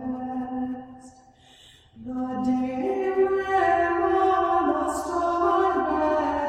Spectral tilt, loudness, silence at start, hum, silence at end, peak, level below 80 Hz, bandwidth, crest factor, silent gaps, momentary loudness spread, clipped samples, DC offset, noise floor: -5.5 dB/octave; -24 LUFS; 0 s; none; 0 s; -10 dBFS; -52 dBFS; 12.5 kHz; 14 dB; none; 11 LU; under 0.1%; under 0.1%; -53 dBFS